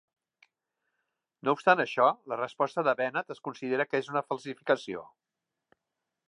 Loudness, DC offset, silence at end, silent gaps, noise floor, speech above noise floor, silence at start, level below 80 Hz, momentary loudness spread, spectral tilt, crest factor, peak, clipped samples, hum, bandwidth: -29 LUFS; under 0.1%; 1.25 s; none; -87 dBFS; 58 dB; 1.45 s; -82 dBFS; 12 LU; -5.5 dB/octave; 24 dB; -8 dBFS; under 0.1%; none; 10.5 kHz